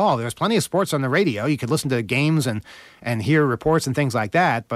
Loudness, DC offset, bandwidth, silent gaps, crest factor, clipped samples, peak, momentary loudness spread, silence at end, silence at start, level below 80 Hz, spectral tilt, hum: -21 LUFS; under 0.1%; 15.5 kHz; none; 14 dB; under 0.1%; -8 dBFS; 6 LU; 0 s; 0 s; -52 dBFS; -5.5 dB/octave; none